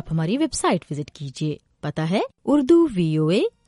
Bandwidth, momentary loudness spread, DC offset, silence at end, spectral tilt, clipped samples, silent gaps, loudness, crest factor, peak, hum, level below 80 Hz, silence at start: 11.5 kHz; 14 LU; under 0.1%; 0.2 s; -6 dB/octave; under 0.1%; none; -22 LUFS; 16 dB; -6 dBFS; none; -50 dBFS; 0.05 s